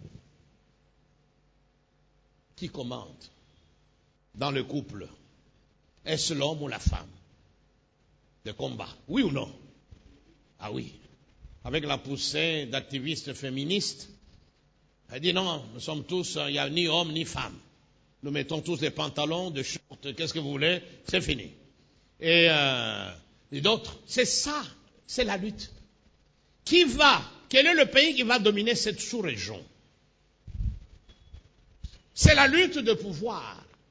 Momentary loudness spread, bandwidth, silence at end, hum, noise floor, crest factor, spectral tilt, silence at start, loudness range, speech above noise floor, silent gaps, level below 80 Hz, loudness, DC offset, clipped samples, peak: 22 LU; 8 kHz; 0.35 s; none; -67 dBFS; 24 dB; -3.5 dB/octave; 0 s; 15 LU; 40 dB; none; -44 dBFS; -26 LUFS; under 0.1%; under 0.1%; -4 dBFS